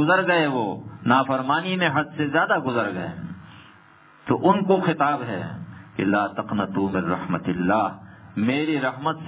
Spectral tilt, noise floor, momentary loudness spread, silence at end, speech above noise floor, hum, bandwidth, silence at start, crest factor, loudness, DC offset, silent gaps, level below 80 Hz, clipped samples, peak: -10 dB/octave; -52 dBFS; 14 LU; 0 s; 29 dB; none; 4 kHz; 0 s; 18 dB; -23 LUFS; under 0.1%; none; -56 dBFS; under 0.1%; -4 dBFS